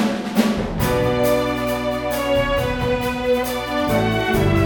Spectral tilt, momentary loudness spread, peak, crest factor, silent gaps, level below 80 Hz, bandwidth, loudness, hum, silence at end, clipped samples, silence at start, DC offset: -5.5 dB/octave; 4 LU; -4 dBFS; 14 dB; none; -34 dBFS; over 20 kHz; -20 LUFS; none; 0 s; under 0.1%; 0 s; under 0.1%